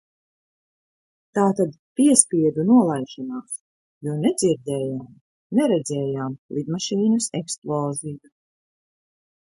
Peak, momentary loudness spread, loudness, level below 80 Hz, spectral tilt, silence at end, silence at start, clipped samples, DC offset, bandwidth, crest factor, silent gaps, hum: 0 dBFS; 16 LU; -22 LUFS; -66 dBFS; -5 dB/octave; 1.3 s; 1.35 s; under 0.1%; under 0.1%; 11.5 kHz; 22 dB; 1.79-1.95 s, 3.60-4.01 s, 5.21-5.50 s, 6.38-6.49 s, 7.58-7.62 s; none